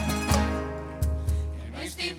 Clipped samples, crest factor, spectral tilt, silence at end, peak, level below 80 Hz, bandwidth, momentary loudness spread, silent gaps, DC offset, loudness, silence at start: under 0.1%; 18 dB; -5 dB/octave; 0 s; -10 dBFS; -34 dBFS; 16.5 kHz; 10 LU; none; under 0.1%; -29 LUFS; 0 s